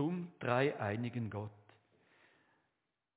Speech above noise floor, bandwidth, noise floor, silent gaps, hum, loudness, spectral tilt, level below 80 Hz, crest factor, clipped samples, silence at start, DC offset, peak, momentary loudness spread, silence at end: 49 dB; 4 kHz; -86 dBFS; none; none; -38 LUFS; -6 dB/octave; -70 dBFS; 22 dB; under 0.1%; 0 s; under 0.1%; -18 dBFS; 11 LU; 1.65 s